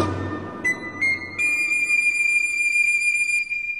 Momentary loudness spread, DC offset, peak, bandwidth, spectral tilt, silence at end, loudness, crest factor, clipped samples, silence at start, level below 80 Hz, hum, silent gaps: 8 LU; 0.2%; -8 dBFS; 13 kHz; -3 dB/octave; 0 s; -19 LUFS; 14 dB; under 0.1%; 0 s; -58 dBFS; none; none